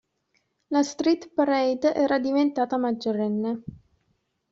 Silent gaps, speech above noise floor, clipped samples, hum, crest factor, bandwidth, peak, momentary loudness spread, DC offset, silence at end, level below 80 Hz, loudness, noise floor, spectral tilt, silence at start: none; 48 dB; under 0.1%; none; 16 dB; 7.8 kHz; -10 dBFS; 6 LU; under 0.1%; 0.8 s; -66 dBFS; -25 LUFS; -72 dBFS; -4.5 dB/octave; 0.7 s